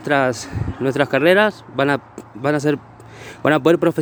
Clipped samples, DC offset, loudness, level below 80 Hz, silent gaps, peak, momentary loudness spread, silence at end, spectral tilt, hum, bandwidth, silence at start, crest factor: under 0.1%; under 0.1%; -18 LUFS; -44 dBFS; none; 0 dBFS; 12 LU; 0 s; -6 dB/octave; none; over 20 kHz; 0 s; 18 dB